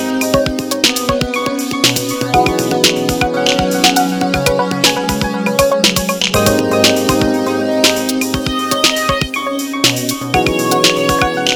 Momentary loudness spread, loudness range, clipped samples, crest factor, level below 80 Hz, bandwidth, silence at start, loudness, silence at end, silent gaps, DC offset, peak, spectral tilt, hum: 5 LU; 1 LU; under 0.1%; 14 dB; -34 dBFS; over 20 kHz; 0 s; -13 LUFS; 0 s; none; under 0.1%; 0 dBFS; -3 dB/octave; none